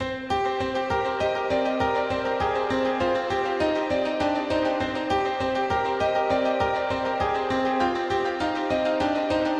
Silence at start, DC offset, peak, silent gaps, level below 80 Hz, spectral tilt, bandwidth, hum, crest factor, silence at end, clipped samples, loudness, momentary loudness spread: 0 s; under 0.1%; -10 dBFS; none; -48 dBFS; -5.5 dB/octave; 11 kHz; none; 14 dB; 0 s; under 0.1%; -25 LUFS; 2 LU